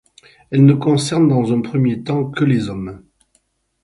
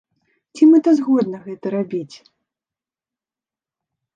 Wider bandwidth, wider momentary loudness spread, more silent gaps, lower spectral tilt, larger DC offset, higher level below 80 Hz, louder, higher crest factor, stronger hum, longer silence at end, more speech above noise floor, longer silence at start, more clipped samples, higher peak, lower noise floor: first, 11.5 kHz vs 7.6 kHz; second, 11 LU vs 16 LU; neither; about the same, -7 dB/octave vs -7.5 dB/octave; neither; first, -50 dBFS vs -74 dBFS; about the same, -16 LUFS vs -16 LUFS; about the same, 16 dB vs 18 dB; neither; second, 0.85 s vs 2.1 s; second, 48 dB vs over 74 dB; about the same, 0.5 s vs 0.55 s; neither; about the same, 0 dBFS vs -2 dBFS; second, -63 dBFS vs under -90 dBFS